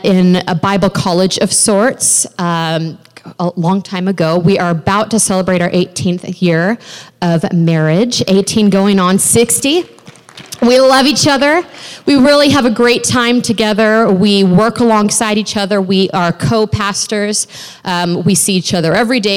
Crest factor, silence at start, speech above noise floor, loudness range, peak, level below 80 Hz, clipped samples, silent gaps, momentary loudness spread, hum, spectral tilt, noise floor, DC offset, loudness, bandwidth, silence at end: 10 dB; 0 s; 24 dB; 4 LU; -2 dBFS; -46 dBFS; under 0.1%; none; 8 LU; none; -4 dB/octave; -36 dBFS; under 0.1%; -11 LUFS; 16.5 kHz; 0 s